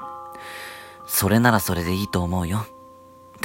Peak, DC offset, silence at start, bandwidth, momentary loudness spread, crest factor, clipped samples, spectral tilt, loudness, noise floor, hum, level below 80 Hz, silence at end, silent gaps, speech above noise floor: -4 dBFS; under 0.1%; 0 s; 16.5 kHz; 19 LU; 20 dB; under 0.1%; -5 dB/octave; -22 LUFS; -47 dBFS; none; -46 dBFS; 0 s; none; 26 dB